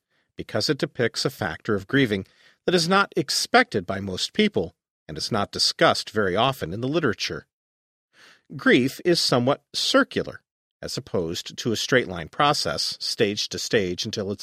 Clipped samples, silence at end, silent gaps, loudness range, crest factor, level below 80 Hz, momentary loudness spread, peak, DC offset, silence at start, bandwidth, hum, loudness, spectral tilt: under 0.1%; 0 s; 4.90-5.06 s, 7.53-8.08 s, 10.51-10.80 s; 2 LU; 22 dB; -56 dBFS; 11 LU; -2 dBFS; under 0.1%; 0.4 s; 15.5 kHz; none; -23 LUFS; -4 dB/octave